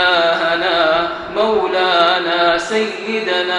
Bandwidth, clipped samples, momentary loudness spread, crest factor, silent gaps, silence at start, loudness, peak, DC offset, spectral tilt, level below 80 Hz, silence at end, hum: 10.5 kHz; under 0.1%; 6 LU; 16 dB; none; 0 s; -15 LUFS; 0 dBFS; under 0.1%; -3 dB/octave; -50 dBFS; 0 s; none